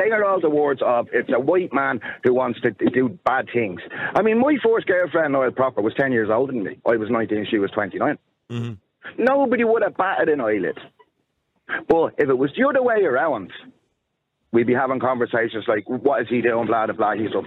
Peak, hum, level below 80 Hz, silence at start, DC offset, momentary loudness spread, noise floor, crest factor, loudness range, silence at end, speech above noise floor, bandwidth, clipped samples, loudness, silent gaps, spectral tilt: -6 dBFS; none; -64 dBFS; 0 s; under 0.1%; 7 LU; -75 dBFS; 16 dB; 2 LU; 0 s; 55 dB; 5.6 kHz; under 0.1%; -21 LUFS; none; -8.5 dB/octave